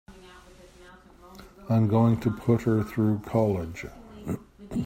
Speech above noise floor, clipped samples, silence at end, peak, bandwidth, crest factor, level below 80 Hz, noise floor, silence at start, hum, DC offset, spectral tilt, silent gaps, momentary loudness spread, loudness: 27 dB; under 0.1%; 0 s; -10 dBFS; 15.5 kHz; 18 dB; -52 dBFS; -51 dBFS; 0.1 s; none; under 0.1%; -9 dB/octave; none; 18 LU; -26 LUFS